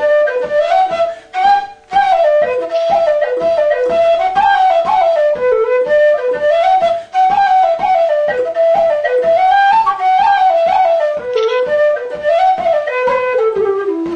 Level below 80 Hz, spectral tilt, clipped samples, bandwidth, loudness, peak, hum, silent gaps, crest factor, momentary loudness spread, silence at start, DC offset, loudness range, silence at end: -50 dBFS; -4 dB/octave; under 0.1%; 9.2 kHz; -13 LUFS; -2 dBFS; none; none; 10 dB; 5 LU; 0 s; under 0.1%; 2 LU; 0 s